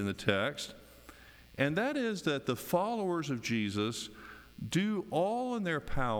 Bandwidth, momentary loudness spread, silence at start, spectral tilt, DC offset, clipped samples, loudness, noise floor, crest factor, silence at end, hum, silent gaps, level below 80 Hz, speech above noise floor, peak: over 20 kHz; 17 LU; 0 s; -5 dB/octave; under 0.1%; under 0.1%; -33 LUFS; -55 dBFS; 18 dB; 0 s; none; none; -52 dBFS; 22 dB; -14 dBFS